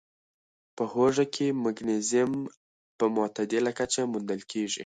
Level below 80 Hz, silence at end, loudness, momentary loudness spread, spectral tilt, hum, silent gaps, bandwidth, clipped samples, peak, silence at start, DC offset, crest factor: -68 dBFS; 0 s; -28 LUFS; 8 LU; -4 dB/octave; none; 2.57-2.99 s; 9.6 kHz; under 0.1%; -12 dBFS; 0.75 s; under 0.1%; 18 dB